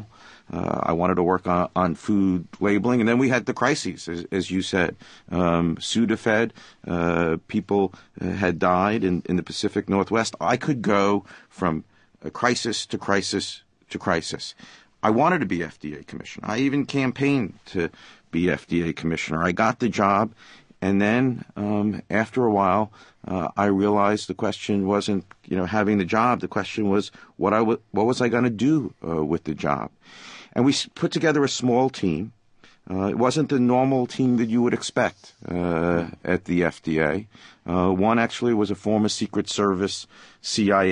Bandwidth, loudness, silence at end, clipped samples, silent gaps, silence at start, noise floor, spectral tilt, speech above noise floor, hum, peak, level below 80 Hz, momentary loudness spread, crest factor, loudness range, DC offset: 10.5 kHz; -23 LUFS; 0 s; under 0.1%; none; 0 s; -55 dBFS; -5.5 dB/octave; 32 dB; none; -4 dBFS; -48 dBFS; 10 LU; 20 dB; 3 LU; under 0.1%